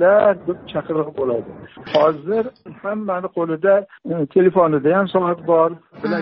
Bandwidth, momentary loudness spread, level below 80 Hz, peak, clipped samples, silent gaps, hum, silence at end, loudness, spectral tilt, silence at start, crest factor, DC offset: 5.8 kHz; 12 LU; -60 dBFS; -2 dBFS; under 0.1%; none; none; 0 s; -19 LUFS; -5.5 dB/octave; 0 s; 16 dB; under 0.1%